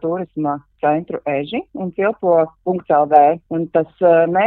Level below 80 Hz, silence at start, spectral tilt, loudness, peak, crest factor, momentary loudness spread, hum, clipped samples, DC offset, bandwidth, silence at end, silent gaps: -58 dBFS; 0.05 s; -10 dB/octave; -17 LUFS; 0 dBFS; 16 dB; 11 LU; none; under 0.1%; under 0.1%; 4.1 kHz; 0 s; none